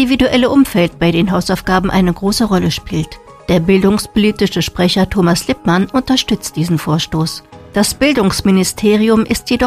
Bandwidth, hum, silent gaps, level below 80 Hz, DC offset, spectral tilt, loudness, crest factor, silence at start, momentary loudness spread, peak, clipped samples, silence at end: 15.5 kHz; none; none; -34 dBFS; under 0.1%; -5 dB/octave; -13 LUFS; 12 dB; 0 s; 6 LU; 0 dBFS; under 0.1%; 0 s